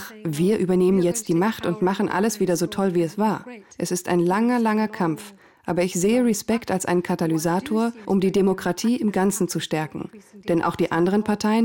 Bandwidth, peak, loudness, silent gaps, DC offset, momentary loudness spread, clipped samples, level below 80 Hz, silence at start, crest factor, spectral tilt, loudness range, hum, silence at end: 17.5 kHz; -12 dBFS; -22 LUFS; none; under 0.1%; 8 LU; under 0.1%; -58 dBFS; 0 s; 10 dB; -5.5 dB/octave; 1 LU; none; 0 s